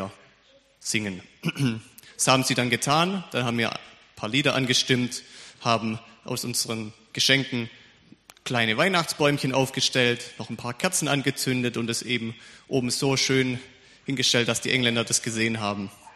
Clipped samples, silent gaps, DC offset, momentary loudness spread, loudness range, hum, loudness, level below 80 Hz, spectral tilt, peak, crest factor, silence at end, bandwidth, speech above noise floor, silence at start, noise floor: under 0.1%; none; under 0.1%; 15 LU; 2 LU; none; -24 LUFS; -62 dBFS; -3.5 dB/octave; -4 dBFS; 22 dB; 0.05 s; 13.5 kHz; 34 dB; 0 s; -59 dBFS